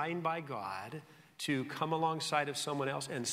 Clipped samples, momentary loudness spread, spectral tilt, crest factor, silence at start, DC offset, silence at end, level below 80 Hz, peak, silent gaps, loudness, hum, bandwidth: under 0.1%; 9 LU; -4 dB/octave; 20 dB; 0 s; under 0.1%; 0 s; -80 dBFS; -16 dBFS; none; -36 LUFS; none; 16 kHz